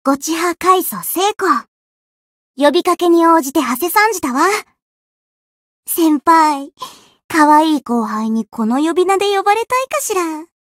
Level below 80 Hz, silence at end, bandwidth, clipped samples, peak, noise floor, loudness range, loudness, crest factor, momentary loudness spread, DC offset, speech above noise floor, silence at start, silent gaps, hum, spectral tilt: -62 dBFS; 0.2 s; 16.5 kHz; under 0.1%; 0 dBFS; under -90 dBFS; 2 LU; -14 LUFS; 16 dB; 9 LU; under 0.1%; over 76 dB; 0.05 s; 1.68-2.54 s, 4.82-5.83 s, 7.24-7.29 s; none; -3 dB/octave